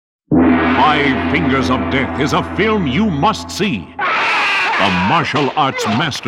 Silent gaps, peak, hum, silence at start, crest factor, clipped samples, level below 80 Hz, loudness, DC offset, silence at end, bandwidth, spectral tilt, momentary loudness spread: none; -2 dBFS; none; 0.3 s; 14 dB; under 0.1%; -38 dBFS; -14 LUFS; under 0.1%; 0 s; 14 kHz; -5 dB/octave; 5 LU